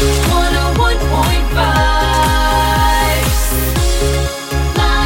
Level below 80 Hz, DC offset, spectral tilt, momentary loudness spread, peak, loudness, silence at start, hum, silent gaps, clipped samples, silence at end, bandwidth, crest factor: -16 dBFS; under 0.1%; -4 dB/octave; 3 LU; -2 dBFS; -14 LUFS; 0 s; none; none; under 0.1%; 0 s; 17 kHz; 12 dB